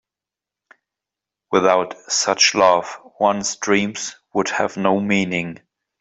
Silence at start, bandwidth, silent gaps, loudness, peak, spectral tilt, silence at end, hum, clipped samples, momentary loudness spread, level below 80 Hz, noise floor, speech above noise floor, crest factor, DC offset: 1.5 s; 8.2 kHz; none; -18 LUFS; -2 dBFS; -3 dB/octave; 0.45 s; none; under 0.1%; 10 LU; -62 dBFS; -88 dBFS; 69 dB; 18 dB; under 0.1%